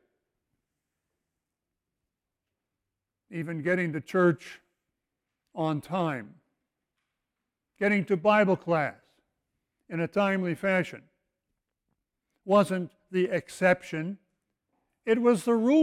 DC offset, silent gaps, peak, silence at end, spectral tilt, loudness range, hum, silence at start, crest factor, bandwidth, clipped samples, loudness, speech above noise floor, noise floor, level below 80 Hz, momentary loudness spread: under 0.1%; none; -10 dBFS; 0 s; -6.5 dB/octave; 8 LU; none; 3.3 s; 20 dB; 15.5 kHz; under 0.1%; -27 LUFS; 61 dB; -87 dBFS; -72 dBFS; 14 LU